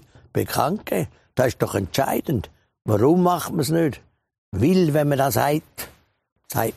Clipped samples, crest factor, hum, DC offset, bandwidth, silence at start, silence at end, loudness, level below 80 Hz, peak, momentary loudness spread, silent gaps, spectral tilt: under 0.1%; 20 dB; none; under 0.1%; 15.5 kHz; 0.35 s; 0.05 s; -22 LUFS; -50 dBFS; -2 dBFS; 15 LU; 4.38-4.52 s, 6.32-6.36 s; -6 dB/octave